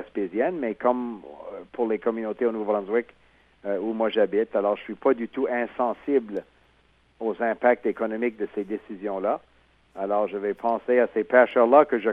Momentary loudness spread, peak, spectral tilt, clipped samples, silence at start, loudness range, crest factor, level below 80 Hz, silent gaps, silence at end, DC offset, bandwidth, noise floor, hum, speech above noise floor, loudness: 14 LU; -4 dBFS; -8 dB/octave; under 0.1%; 0 s; 3 LU; 22 dB; -66 dBFS; none; 0 s; under 0.1%; 5 kHz; -62 dBFS; none; 38 dB; -25 LUFS